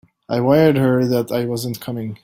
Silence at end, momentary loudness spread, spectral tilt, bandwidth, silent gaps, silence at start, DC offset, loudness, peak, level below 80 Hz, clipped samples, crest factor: 0.1 s; 12 LU; -7 dB/octave; 16.5 kHz; none; 0.3 s; under 0.1%; -18 LUFS; -2 dBFS; -54 dBFS; under 0.1%; 16 dB